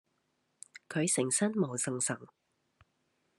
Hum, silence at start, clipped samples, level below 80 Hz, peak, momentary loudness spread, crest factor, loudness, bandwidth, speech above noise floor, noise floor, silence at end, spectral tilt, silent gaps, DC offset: none; 0.9 s; under 0.1%; -82 dBFS; -16 dBFS; 17 LU; 20 dB; -32 LUFS; 13 kHz; 46 dB; -78 dBFS; 1.1 s; -4 dB/octave; none; under 0.1%